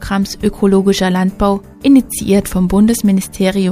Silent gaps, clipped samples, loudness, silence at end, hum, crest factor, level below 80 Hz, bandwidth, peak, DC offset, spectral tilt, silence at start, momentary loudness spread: none; under 0.1%; -13 LUFS; 0 s; none; 12 dB; -32 dBFS; 15.5 kHz; 0 dBFS; under 0.1%; -6 dB/octave; 0 s; 5 LU